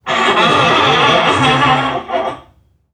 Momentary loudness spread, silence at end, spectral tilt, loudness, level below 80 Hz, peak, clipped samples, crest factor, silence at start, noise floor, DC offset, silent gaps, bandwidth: 10 LU; 0.55 s; -4 dB/octave; -11 LUFS; -44 dBFS; 0 dBFS; under 0.1%; 12 dB; 0.05 s; -50 dBFS; under 0.1%; none; 12.5 kHz